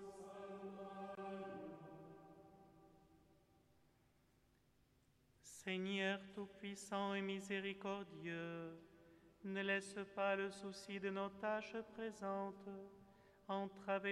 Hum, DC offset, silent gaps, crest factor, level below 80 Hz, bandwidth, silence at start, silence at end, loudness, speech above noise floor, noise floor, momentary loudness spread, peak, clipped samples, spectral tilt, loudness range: none; under 0.1%; none; 20 dB; -82 dBFS; 13 kHz; 0 s; 0 s; -46 LUFS; 31 dB; -76 dBFS; 20 LU; -28 dBFS; under 0.1%; -5 dB/octave; 12 LU